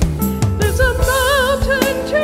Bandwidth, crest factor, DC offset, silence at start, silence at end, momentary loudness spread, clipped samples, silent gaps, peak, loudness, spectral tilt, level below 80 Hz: 16 kHz; 14 dB; under 0.1%; 0 s; 0 s; 4 LU; under 0.1%; none; -2 dBFS; -16 LUFS; -4.5 dB/octave; -24 dBFS